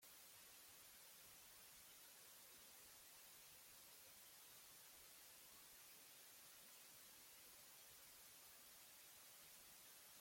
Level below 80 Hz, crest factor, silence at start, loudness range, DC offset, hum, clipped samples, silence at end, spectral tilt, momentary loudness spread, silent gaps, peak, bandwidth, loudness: under -90 dBFS; 14 dB; 0 s; 0 LU; under 0.1%; none; under 0.1%; 0 s; 0 dB/octave; 0 LU; none; -52 dBFS; 16.5 kHz; -62 LUFS